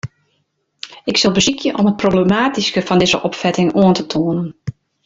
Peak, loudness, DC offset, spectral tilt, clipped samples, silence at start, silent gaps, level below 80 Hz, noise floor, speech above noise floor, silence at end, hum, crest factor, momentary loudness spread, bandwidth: -2 dBFS; -15 LUFS; under 0.1%; -4.5 dB/octave; under 0.1%; 0.05 s; none; -48 dBFS; -66 dBFS; 51 dB; 0.35 s; none; 14 dB; 17 LU; 7.8 kHz